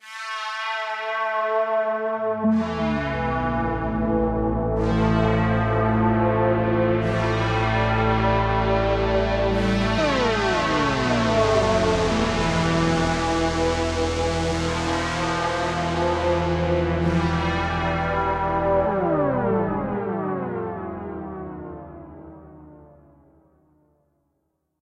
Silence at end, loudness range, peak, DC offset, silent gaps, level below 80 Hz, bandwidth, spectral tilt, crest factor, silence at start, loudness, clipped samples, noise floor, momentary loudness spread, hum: 1.95 s; 7 LU; -8 dBFS; under 0.1%; none; -34 dBFS; 11 kHz; -6 dB/octave; 16 dB; 0.05 s; -22 LUFS; under 0.1%; -73 dBFS; 7 LU; none